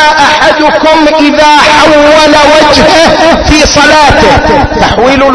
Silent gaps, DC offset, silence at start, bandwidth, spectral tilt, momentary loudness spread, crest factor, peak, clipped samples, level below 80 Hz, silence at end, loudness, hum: none; under 0.1%; 0 s; 11 kHz; -3.5 dB/octave; 3 LU; 4 dB; 0 dBFS; 20%; -20 dBFS; 0 s; -3 LUFS; none